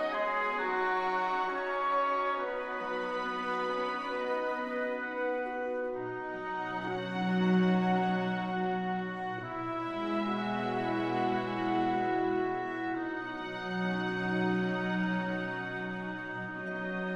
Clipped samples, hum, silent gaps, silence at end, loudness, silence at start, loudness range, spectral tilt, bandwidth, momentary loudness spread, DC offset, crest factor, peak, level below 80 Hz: under 0.1%; none; none; 0 s; -33 LUFS; 0 s; 3 LU; -7.5 dB/octave; 7.8 kHz; 7 LU; under 0.1%; 14 dB; -18 dBFS; -66 dBFS